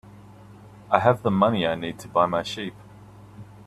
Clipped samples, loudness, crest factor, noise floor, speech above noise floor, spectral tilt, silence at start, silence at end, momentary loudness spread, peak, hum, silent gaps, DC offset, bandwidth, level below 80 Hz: under 0.1%; -23 LUFS; 24 dB; -46 dBFS; 24 dB; -6.5 dB/octave; 0.05 s; 0.05 s; 11 LU; -2 dBFS; none; none; under 0.1%; 13.5 kHz; -58 dBFS